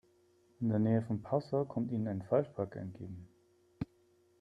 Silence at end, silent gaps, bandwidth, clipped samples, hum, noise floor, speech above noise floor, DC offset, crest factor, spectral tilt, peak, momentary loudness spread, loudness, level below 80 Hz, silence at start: 0.55 s; none; 7 kHz; under 0.1%; none; -69 dBFS; 35 dB; under 0.1%; 20 dB; -10.5 dB/octave; -16 dBFS; 14 LU; -36 LUFS; -68 dBFS; 0.6 s